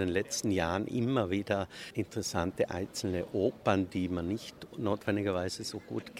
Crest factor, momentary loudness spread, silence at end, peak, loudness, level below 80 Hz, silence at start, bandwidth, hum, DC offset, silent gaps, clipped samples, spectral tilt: 20 dB; 7 LU; 0 s; -12 dBFS; -33 LUFS; -58 dBFS; 0 s; 16 kHz; none; under 0.1%; none; under 0.1%; -5 dB/octave